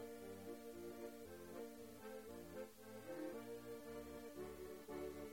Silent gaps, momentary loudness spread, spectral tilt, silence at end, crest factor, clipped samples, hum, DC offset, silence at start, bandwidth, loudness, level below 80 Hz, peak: none; 4 LU; -5 dB/octave; 0 s; 14 dB; under 0.1%; none; under 0.1%; 0 s; 16.5 kHz; -54 LUFS; -72 dBFS; -38 dBFS